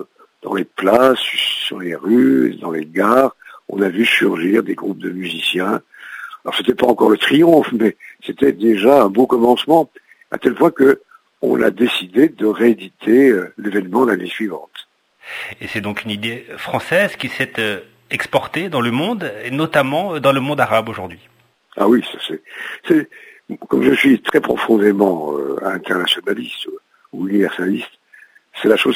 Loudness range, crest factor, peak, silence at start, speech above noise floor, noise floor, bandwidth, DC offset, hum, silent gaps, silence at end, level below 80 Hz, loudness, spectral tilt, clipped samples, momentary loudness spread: 6 LU; 16 dB; 0 dBFS; 0 s; 32 dB; -48 dBFS; 16 kHz; under 0.1%; none; none; 0 s; -58 dBFS; -16 LUFS; -5.5 dB/octave; under 0.1%; 16 LU